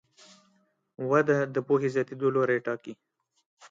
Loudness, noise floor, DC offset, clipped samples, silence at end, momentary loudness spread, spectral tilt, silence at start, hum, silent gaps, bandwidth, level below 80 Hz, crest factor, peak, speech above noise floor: -27 LUFS; -69 dBFS; under 0.1%; under 0.1%; 0.05 s; 13 LU; -7.5 dB/octave; 1 s; none; 3.46-3.57 s; 7.6 kHz; -76 dBFS; 20 dB; -10 dBFS; 42 dB